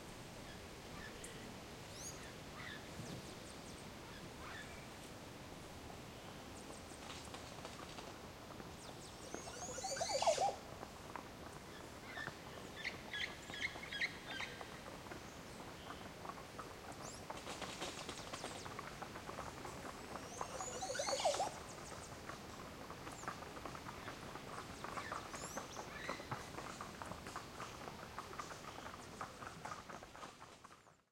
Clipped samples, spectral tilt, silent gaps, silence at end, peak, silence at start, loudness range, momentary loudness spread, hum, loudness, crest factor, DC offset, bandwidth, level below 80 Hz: under 0.1%; -3 dB/octave; none; 0.15 s; -24 dBFS; 0 s; 9 LU; 11 LU; none; -47 LUFS; 24 dB; under 0.1%; 16.5 kHz; -66 dBFS